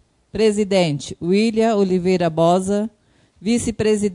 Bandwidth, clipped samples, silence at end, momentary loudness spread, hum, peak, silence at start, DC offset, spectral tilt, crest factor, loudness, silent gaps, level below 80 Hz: 11 kHz; under 0.1%; 0 s; 8 LU; none; -4 dBFS; 0.35 s; under 0.1%; -6 dB/octave; 14 dB; -19 LUFS; none; -50 dBFS